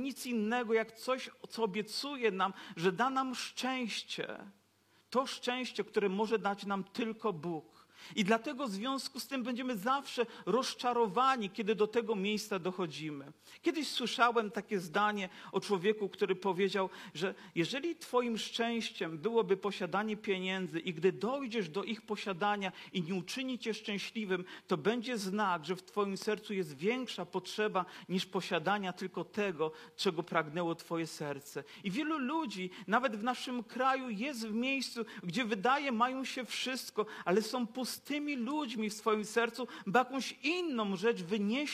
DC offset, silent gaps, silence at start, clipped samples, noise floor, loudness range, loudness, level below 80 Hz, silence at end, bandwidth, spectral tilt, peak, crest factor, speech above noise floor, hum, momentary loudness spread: under 0.1%; none; 0 s; under 0.1%; -70 dBFS; 3 LU; -35 LUFS; -88 dBFS; 0 s; 15 kHz; -4.5 dB/octave; -14 dBFS; 20 dB; 35 dB; none; 7 LU